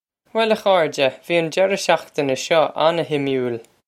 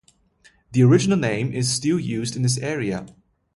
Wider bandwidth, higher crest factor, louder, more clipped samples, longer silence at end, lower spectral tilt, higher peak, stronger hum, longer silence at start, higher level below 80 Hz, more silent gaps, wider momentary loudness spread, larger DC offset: first, 15.5 kHz vs 11.5 kHz; about the same, 18 dB vs 18 dB; about the same, -19 LUFS vs -21 LUFS; neither; second, 0.25 s vs 0.45 s; second, -4 dB/octave vs -5.5 dB/octave; first, 0 dBFS vs -4 dBFS; neither; second, 0.35 s vs 0.7 s; second, -68 dBFS vs -54 dBFS; neither; second, 6 LU vs 10 LU; neither